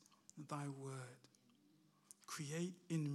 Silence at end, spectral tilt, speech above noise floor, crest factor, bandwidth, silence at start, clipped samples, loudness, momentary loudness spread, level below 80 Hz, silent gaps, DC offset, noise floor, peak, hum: 0 s; -5.5 dB/octave; 28 dB; 16 dB; 14.5 kHz; 0.35 s; under 0.1%; -49 LUFS; 18 LU; under -90 dBFS; none; under 0.1%; -74 dBFS; -32 dBFS; none